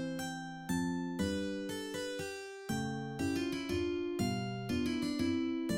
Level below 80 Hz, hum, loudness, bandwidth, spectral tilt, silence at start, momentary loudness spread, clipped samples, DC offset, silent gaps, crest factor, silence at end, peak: -62 dBFS; none; -37 LUFS; 16.5 kHz; -5.5 dB/octave; 0 s; 6 LU; under 0.1%; under 0.1%; none; 14 dB; 0 s; -22 dBFS